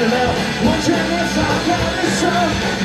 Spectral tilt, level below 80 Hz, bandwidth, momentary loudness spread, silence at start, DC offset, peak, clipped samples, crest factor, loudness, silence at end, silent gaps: -4.5 dB/octave; -34 dBFS; 15.5 kHz; 2 LU; 0 s; under 0.1%; -2 dBFS; under 0.1%; 14 dB; -17 LUFS; 0 s; none